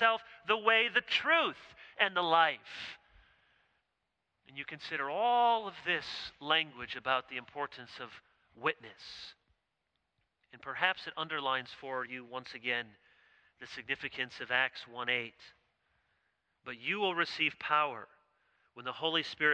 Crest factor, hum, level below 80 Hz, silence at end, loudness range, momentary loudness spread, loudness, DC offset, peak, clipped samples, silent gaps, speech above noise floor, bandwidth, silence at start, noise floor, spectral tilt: 24 dB; none; -76 dBFS; 0 s; 7 LU; 19 LU; -33 LUFS; under 0.1%; -12 dBFS; under 0.1%; none; 50 dB; 9.2 kHz; 0 s; -84 dBFS; -3.5 dB/octave